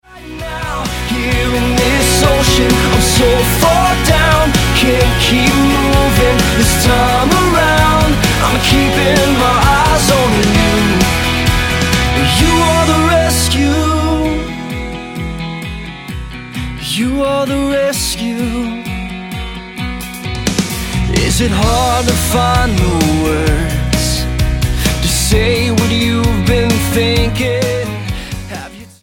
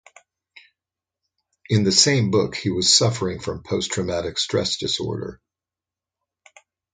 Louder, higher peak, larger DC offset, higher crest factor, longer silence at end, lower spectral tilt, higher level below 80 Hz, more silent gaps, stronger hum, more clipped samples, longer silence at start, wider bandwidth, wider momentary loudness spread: first, -12 LUFS vs -20 LUFS; about the same, 0 dBFS vs -2 dBFS; neither; second, 12 dB vs 22 dB; second, 0.15 s vs 1.6 s; about the same, -4.5 dB/octave vs -3.5 dB/octave; first, -20 dBFS vs -48 dBFS; neither; neither; neither; second, 0.1 s vs 1.7 s; first, 17 kHz vs 9.6 kHz; about the same, 13 LU vs 12 LU